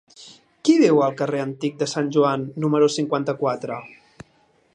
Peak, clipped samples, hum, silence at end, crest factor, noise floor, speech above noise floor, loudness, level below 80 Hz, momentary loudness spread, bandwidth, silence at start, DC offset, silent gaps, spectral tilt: -4 dBFS; under 0.1%; none; 0.85 s; 18 dB; -60 dBFS; 39 dB; -21 LUFS; -68 dBFS; 10 LU; 10.5 kHz; 0.2 s; under 0.1%; none; -6 dB/octave